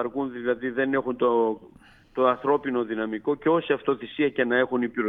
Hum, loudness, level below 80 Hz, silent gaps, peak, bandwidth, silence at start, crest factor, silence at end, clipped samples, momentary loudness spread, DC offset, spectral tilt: none; -25 LUFS; -62 dBFS; none; -8 dBFS; 4 kHz; 0 s; 18 dB; 0 s; under 0.1%; 6 LU; under 0.1%; -8.5 dB/octave